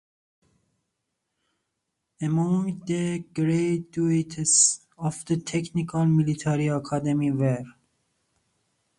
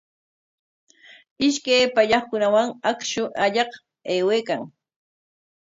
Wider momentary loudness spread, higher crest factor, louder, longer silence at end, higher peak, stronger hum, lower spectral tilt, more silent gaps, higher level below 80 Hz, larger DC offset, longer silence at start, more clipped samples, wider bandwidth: about the same, 10 LU vs 10 LU; about the same, 20 dB vs 18 dB; about the same, -24 LUFS vs -22 LUFS; first, 1.3 s vs 0.95 s; about the same, -6 dBFS vs -4 dBFS; neither; first, -5 dB/octave vs -3 dB/octave; neither; about the same, -62 dBFS vs -64 dBFS; neither; first, 2.2 s vs 1.4 s; neither; first, 11.5 kHz vs 8 kHz